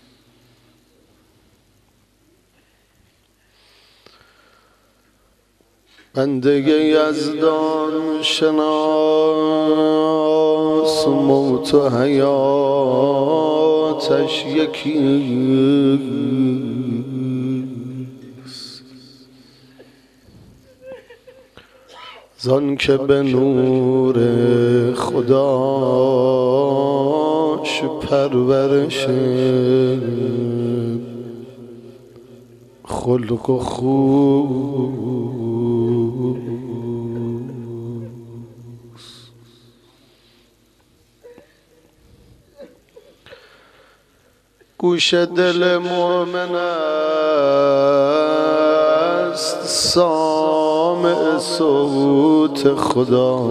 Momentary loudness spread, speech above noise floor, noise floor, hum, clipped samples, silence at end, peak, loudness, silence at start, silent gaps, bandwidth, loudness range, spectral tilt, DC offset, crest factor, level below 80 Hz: 12 LU; 42 dB; -58 dBFS; none; under 0.1%; 0 s; -2 dBFS; -17 LUFS; 6.15 s; none; 14 kHz; 11 LU; -6 dB/octave; under 0.1%; 16 dB; -54 dBFS